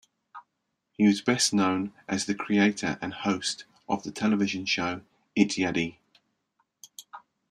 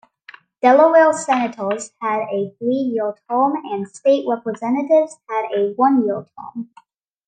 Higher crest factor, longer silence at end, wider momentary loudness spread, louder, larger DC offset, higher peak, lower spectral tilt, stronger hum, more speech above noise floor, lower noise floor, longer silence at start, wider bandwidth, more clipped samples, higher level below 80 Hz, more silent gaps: first, 22 dB vs 16 dB; second, 0.35 s vs 0.65 s; about the same, 13 LU vs 14 LU; second, -27 LUFS vs -18 LUFS; neither; second, -8 dBFS vs -2 dBFS; about the same, -4 dB/octave vs -5 dB/octave; neither; first, 54 dB vs 28 dB; first, -80 dBFS vs -46 dBFS; second, 0.35 s vs 0.65 s; first, 13 kHz vs 9.6 kHz; neither; first, -68 dBFS vs -74 dBFS; neither